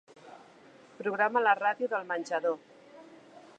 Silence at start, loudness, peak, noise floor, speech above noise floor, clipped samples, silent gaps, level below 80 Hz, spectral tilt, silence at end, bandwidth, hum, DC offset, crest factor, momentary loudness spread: 0.25 s; -30 LUFS; -10 dBFS; -56 dBFS; 27 dB; under 0.1%; none; -88 dBFS; -4.5 dB/octave; 0.2 s; 9.2 kHz; none; under 0.1%; 22 dB; 10 LU